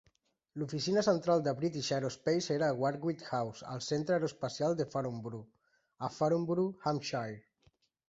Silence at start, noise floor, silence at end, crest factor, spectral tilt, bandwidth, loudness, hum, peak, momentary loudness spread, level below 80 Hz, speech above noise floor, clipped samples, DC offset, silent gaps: 0.55 s; -71 dBFS; 0.7 s; 18 dB; -5.5 dB/octave; 8 kHz; -34 LUFS; none; -16 dBFS; 12 LU; -72 dBFS; 38 dB; under 0.1%; under 0.1%; none